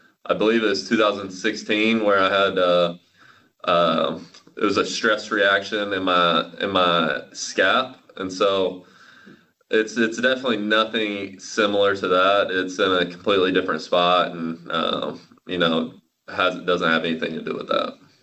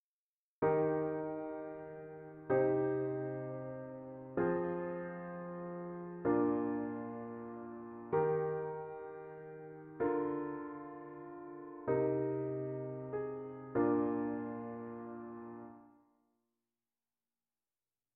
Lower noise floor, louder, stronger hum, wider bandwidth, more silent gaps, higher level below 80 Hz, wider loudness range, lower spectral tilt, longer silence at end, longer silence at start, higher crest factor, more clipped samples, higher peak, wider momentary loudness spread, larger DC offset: second, -54 dBFS vs under -90 dBFS; first, -21 LUFS vs -38 LUFS; neither; first, 8.6 kHz vs 3.4 kHz; neither; first, -60 dBFS vs -72 dBFS; about the same, 3 LU vs 5 LU; second, -4 dB/octave vs -9.5 dB/octave; second, 0.3 s vs 2.25 s; second, 0.25 s vs 0.6 s; about the same, 18 dB vs 18 dB; neither; first, -4 dBFS vs -20 dBFS; second, 10 LU vs 16 LU; neither